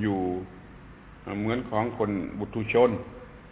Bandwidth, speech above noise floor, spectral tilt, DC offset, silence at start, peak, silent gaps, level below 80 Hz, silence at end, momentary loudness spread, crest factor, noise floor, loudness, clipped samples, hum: 4 kHz; 20 dB; -6 dB/octave; under 0.1%; 0 s; -8 dBFS; none; -50 dBFS; 0 s; 24 LU; 20 dB; -47 dBFS; -28 LUFS; under 0.1%; none